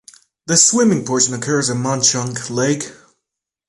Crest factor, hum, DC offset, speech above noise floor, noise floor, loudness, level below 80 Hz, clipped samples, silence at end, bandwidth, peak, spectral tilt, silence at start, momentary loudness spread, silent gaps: 18 dB; none; under 0.1%; 64 dB; -81 dBFS; -15 LUFS; -58 dBFS; under 0.1%; 0.75 s; 11.5 kHz; 0 dBFS; -3 dB/octave; 0.45 s; 11 LU; none